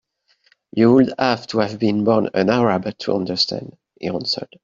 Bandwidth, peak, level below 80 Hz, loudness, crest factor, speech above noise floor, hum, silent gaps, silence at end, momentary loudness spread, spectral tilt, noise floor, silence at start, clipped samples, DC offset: 7.6 kHz; -2 dBFS; -58 dBFS; -19 LUFS; 18 dB; 44 dB; none; none; 0.2 s; 11 LU; -6 dB/octave; -62 dBFS; 0.75 s; under 0.1%; under 0.1%